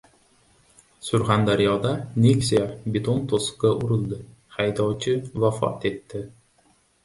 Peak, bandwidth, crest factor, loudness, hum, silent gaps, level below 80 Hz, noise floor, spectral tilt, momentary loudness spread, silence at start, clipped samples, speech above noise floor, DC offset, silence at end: -6 dBFS; 11.5 kHz; 18 dB; -23 LUFS; none; none; -52 dBFS; -62 dBFS; -6 dB/octave; 15 LU; 1.05 s; under 0.1%; 39 dB; under 0.1%; 0.75 s